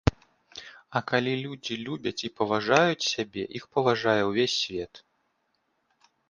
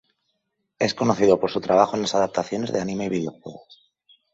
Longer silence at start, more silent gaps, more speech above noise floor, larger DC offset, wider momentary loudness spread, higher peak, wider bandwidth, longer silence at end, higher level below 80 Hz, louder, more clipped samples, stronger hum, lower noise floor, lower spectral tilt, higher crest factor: second, 0.05 s vs 0.8 s; neither; second, 47 dB vs 53 dB; neither; first, 16 LU vs 10 LU; about the same, -4 dBFS vs -2 dBFS; first, 10 kHz vs 8 kHz; first, 1.35 s vs 0.75 s; first, -48 dBFS vs -60 dBFS; second, -27 LUFS vs -22 LUFS; neither; neither; about the same, -74 dBFS vs -75 dBFS; about the same, -4.5 dB/octave vs -5 dB/octave; about the same, 24 dB vs 22 dB